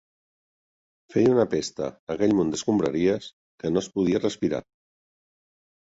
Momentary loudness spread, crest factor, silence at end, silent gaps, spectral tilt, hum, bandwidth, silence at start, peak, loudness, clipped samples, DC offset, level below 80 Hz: 11 LU; 18 dB; 1.3 s; 1.99-2.07 s, 3.33-3.58 s; -6 dB/octave; none; 8 kHz; 1.1 s; -8 dBFS; -25 LUFS; under 0.1%; under 0.1%; -58 dBFS